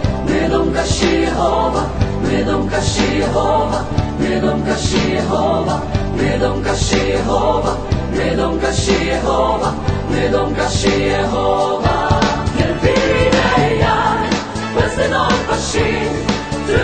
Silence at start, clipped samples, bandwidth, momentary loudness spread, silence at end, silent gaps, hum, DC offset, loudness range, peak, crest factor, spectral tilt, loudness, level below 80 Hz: 0 s; under 0.1%; 9.2 kHz; 4 LU; 0 s; none; none; under 0.1%; 2 LU; 0 dBFS; 16 dB; -5 dB/octave; -16 LUFS; -26 dBFS